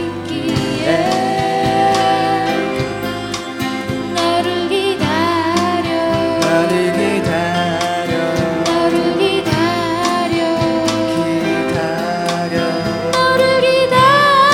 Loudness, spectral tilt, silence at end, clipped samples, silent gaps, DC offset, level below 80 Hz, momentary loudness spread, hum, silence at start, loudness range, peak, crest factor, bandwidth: -15 LUFS; -5 dB/octave; 0 s; under 0.1%; none; under 0.1%; -44 dBFS; 7 LU; none; 0 s; 2 LU; 0 dBFS; 14 dB; 16.5 kHz